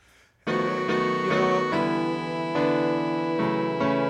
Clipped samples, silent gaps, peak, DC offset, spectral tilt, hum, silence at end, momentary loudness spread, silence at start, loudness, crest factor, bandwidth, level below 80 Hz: under 0.1%; none; -10 dBFS; under 0.1%; -6.5 dB/octave; none; 0 s; 5 LU; 0.45 s; -25 LUFS; 14 dB; 10 kHz; -62 dBFS